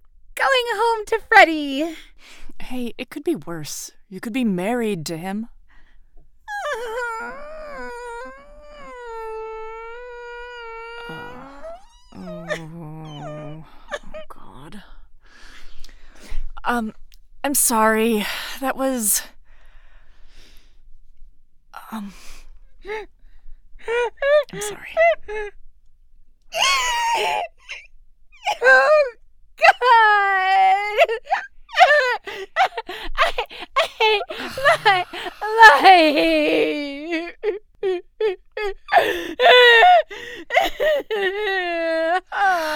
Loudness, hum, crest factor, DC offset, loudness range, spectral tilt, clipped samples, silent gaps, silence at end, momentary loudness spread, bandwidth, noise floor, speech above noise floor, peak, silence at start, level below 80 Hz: -18 LUFS; none; 20 dB; under 0.1%; 19 LU; -2 dB/octave; under 0.1%; none; 0 s; 22 LU; over 20 kHz; -46 dBFS; 28 dB; 0 dBFS; 0.3 s; -42 dBFS